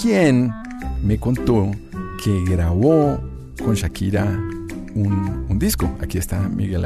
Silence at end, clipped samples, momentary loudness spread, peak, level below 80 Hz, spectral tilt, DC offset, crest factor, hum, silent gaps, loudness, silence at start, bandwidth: 0 s; under 0.1%; 13 LU; -2 dBFS; -32 dBFS; -7 dB/octave; under 0.1%; 16 dB; none; none; -20 LUFS; 0 s; 14 kHz